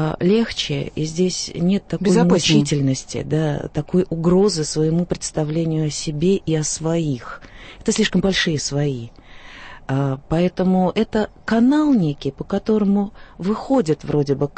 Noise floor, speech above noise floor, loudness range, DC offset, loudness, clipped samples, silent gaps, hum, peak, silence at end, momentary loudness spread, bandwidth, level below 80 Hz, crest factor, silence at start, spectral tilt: -38 dBFS; 19 dB; 3 LU; under 0.1%; -20 LUFS; under 0.1%; none; none; -2 dBFS; 0.05 s; 9 LU; 8.8 kHz; -42 dBFS; 18 dB; 0 s; -5.5 dB/octave